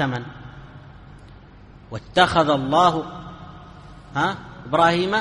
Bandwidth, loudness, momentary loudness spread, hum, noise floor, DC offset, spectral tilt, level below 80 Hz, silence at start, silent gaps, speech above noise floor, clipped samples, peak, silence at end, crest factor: 11 kHz; -20 LUFS; 24 LU; none; -45 dBFS; under 0.1%; -5.5 dB/octave; -48 dBFS; 0 s; none; 25 dB; under 0.1%; -2 dBFS; 0 s; 20 dB